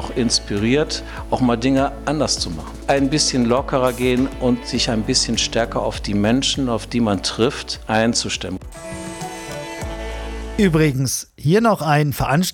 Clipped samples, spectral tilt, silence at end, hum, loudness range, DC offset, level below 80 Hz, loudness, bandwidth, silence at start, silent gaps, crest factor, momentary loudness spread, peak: under 0.1%; -4.5 dB/octave; 0 s; none; 4 LU; under 0.1%; -34 dBFS; -19 LUFS; 18.5 kHz; 0 s; none; 16 dB; 13 LU; -4 dBFS